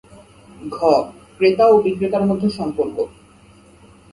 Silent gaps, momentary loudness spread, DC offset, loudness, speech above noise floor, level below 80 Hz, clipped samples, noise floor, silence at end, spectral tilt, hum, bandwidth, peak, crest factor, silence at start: none; 16 LU; under 0.1%; -18 LUFS; 31 dB; -52 dBFS; under 0.1%; -48 dBFS; 1.05 s; -7 dB/octave; none; 11.5 kHz; 0 dBFS; 18 dB; 0.6 s